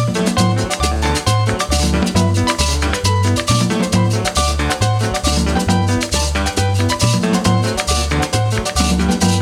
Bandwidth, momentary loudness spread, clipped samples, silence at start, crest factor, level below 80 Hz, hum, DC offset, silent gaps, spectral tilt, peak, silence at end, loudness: 16 kHz; 2 LU; under 0.1%; 0 s; 14 dB; -24 dBFS; none; under 0.1%; none; -4.5 dB/octave; -2 dBFS; 0 s; -16 LUFS